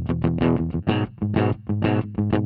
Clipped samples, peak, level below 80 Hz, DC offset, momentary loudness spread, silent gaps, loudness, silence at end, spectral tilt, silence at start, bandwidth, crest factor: under 0.1%; -6 dBFS; -42 dBFS; under 0.1%; 3 LU; none; -23 LUFS; 0 s; -12 dB/octave; 0 s; 4.7 kHz; 16 dB